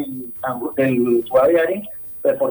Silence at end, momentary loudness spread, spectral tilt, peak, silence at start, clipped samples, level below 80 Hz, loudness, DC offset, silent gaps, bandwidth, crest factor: 0 s; 11 LU; -8.5 dB/octave; -4 dBFS; 0 s; under 0.1%; -56 dBFS; -19 LUFS; under 0.1%; none; over 20 kHz; 14 dB